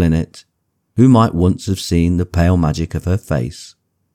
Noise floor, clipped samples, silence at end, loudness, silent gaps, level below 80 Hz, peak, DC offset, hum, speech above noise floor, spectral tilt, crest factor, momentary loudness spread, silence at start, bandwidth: -68 dBFS; under 0.1%; 0.45 s; -16 LUFS; none; -32 dBFS; -2 dBFS; under 0.1%; none; 54 dB; -7 dB/octave; 14 dB; 14 LU; 0 s; 14.5 kHz